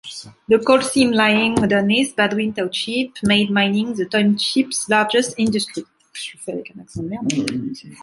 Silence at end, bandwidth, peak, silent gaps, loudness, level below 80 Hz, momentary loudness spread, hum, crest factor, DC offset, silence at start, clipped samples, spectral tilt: 0.05 s; 11.5 kHz; -2 dBFS; none; -18 LUFS; -54 dBFS; 16 LU; none; 18 dB; under 0.1%; 0.05 s; under 0.1%; -4 dB/octave